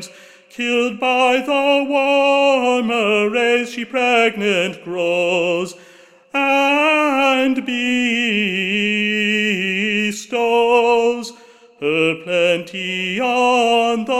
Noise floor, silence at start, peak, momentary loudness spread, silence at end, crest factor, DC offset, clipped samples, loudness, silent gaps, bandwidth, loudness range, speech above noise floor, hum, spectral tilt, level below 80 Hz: -47 dBFS; 0 s; -2 dBFS; 7 LU; 0 s; 14 dB; under 0.1%; under 0.1%; -16 LUFS; none; 15.5 kHz; 2 LU; 30 dB; none; -4 dB/octave; -64 dBFS